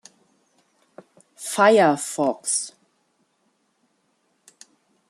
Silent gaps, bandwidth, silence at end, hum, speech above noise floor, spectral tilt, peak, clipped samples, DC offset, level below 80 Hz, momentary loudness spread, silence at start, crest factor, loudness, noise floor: none; 13.5 kHz; 2.4 s; none; 50 dB; -3 dB/octave; -4 dBFS; under 0.1%; under 0.1%; -78 dBFS; 17 LU; 1.4 s; 22 dB; -20 LUFS; -69 dBFS